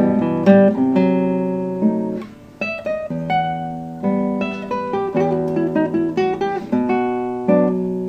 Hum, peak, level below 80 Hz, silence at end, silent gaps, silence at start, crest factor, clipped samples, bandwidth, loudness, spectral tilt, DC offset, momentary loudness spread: none; 0 dBFS; -52 dBFS; 0 s; none; 0 s; 18 dB; under 0.1%; 7 kHz; -19 LUFS; -9 dB/octave; under 0.1%; 10 LU